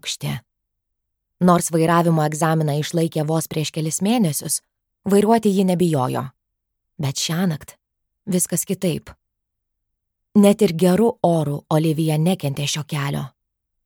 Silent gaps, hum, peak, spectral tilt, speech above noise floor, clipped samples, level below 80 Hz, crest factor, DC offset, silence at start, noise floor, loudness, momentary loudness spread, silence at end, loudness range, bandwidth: none; none; -2 dBFS; -5.5 dB/octave; 59 dB; under 0.1%; -58 dBFS; 18 dB; under 0.1%; 0.05 s; -78 dBFS; -20 LUFS; 11 LU; 0.6 s; 6 LU; 19 kHz